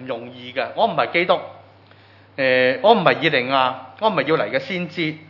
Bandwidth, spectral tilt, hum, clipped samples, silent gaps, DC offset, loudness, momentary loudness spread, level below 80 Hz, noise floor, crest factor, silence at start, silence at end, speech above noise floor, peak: 6 kHz; -7 dB/octave; none; under 0.1%; none; under 0.1%; -19 LUFS; 13 LU; -76 dBFS; -49 dBFS; 20 dB; 0 s; 0.05 s; 29 dB; 0 dBFS